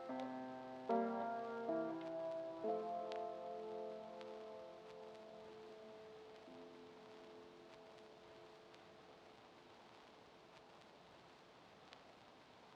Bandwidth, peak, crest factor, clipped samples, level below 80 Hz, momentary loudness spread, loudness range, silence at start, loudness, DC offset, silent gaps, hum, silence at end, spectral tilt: 10 kHz; -28 dBFS; 22 dB; under 0.1%; -88 dBFS; 20 LU; 18 LU; 0 s; -48 LUFS; under 0.1%; none; none; 0 s; -6 dB/octave